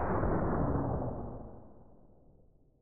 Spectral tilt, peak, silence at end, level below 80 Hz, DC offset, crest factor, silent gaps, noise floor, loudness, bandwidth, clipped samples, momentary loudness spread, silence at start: -13.5 dB/octave; -18 dBFS; 0 s; -44 dBFS; under 0.1%; 16 dB; none; -63 dBFS; -34 LUFS; 2.7 kHz; under 0.1%; 18 LU; 0 s